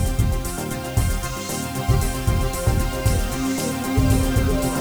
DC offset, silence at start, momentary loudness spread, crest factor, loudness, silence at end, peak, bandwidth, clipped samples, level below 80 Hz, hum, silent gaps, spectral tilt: under 0.1%; 0 s; 7 LU; 14 dB; -22 LUFS; 0 s; -6 dBFS; over 20 kHz; under 0.1%; -26 dBFS; none; none; -5.5 dB/octave